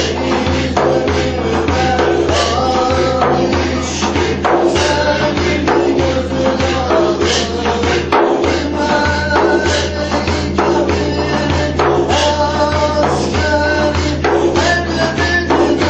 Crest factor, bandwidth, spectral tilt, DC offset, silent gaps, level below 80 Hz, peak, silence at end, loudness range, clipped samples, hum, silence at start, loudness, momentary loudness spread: 14 dB; 8.8 kHz; -5 dB/octave; under 0.1%; none; -28 dBFS; 0 dBFS; 0 s; 1 LU; under 0.1%; none; 0 s; -14 LUFS; 3 LU